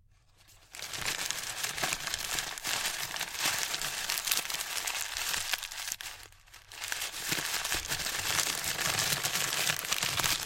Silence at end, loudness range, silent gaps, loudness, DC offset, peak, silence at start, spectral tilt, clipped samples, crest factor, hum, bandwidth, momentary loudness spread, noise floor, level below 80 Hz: 0 s; 4 LU; none; -31 LUFS; under 0.1%; -6 dBFS; 0.5 s; 0 dB/octave; under 0.1%; 28 dB; none; 17 kHz; 8 LU; -62 dBFS; -58 dBFS